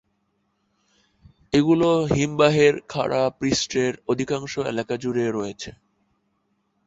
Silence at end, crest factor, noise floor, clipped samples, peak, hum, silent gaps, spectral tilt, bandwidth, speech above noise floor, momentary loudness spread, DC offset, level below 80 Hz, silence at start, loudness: 1.15 s; 20 dB; -71 dBFS; under 0.1%; -4 dBFS; none; none; -5 dB/octave; 8 kHz; 49 dB; 9 LU; under 0.1%; -52 dBFS; 1.5 s; -22 LUFS